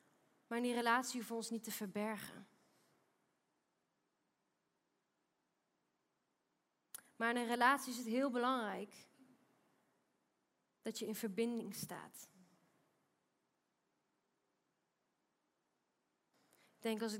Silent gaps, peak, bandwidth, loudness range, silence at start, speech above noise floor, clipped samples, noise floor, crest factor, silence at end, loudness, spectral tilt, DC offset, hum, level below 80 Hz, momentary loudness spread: none; -18 dBFS; 16 kHz; 12 LU; 0.5 s; 46 dB; under 0.1%; -86 dBFS; 28 dB; 0 s; -40 LUFS; -3.5 dB/octave; under 0.1%; none; under -90 dBFS; 20 LU